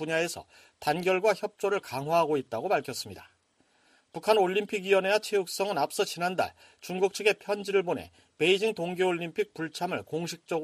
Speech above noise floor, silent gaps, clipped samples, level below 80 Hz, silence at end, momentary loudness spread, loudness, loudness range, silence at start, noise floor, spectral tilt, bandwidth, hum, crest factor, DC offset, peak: 40 dB; none; under 0.1%; -72 dBFS; 0 s; 10 LU; -29 LUFS; 2 LU; 0 s; -68 dBFS; -4 dB/octave; 15 kHz; none; 20 dB; under 0.1%; -8 dBFS